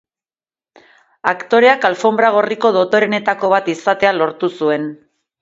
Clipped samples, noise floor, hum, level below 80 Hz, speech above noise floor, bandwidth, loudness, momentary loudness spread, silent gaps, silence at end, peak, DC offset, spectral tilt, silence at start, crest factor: under 0.1%; under -90 dBFS; none; -62 dBFS; over 76 dB; 7.8 kHz; -15 LUFS; 8 LU; none; 0.45 s; 0 dBFS; under 0.1%; -5 dB/octave; 1.25 s; 16 dB